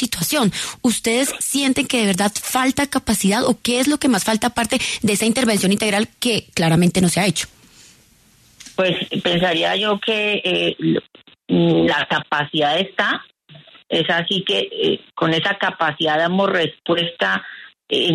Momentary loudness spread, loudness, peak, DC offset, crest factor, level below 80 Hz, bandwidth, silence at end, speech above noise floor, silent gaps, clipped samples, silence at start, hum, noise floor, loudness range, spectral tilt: 4 LU; -18 LUFS; -6 dBFS; under 0.1%; 14 dB; -50 dBFS; 13.5 kHz; 0 s; 34 dB; none; under 0.1%; 0 s; none; -53 dBFS; 2 LU; -3.5 dB/octave